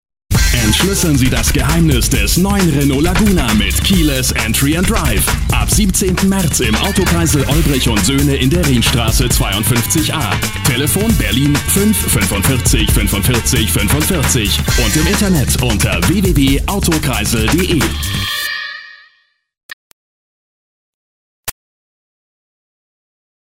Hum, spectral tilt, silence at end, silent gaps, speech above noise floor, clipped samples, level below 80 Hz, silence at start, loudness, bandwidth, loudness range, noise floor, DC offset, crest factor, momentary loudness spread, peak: none; -4 dB/octave; 2.05 s; 19.63-21.43 s; 45 dB; under 0.1%; -20 dBFS; 0.3 s; -13 LUFS; 16.5 kHz; 4 LU; -57 dBFS; under 0.1%; 12 dB; 3 LU; 0 dBFS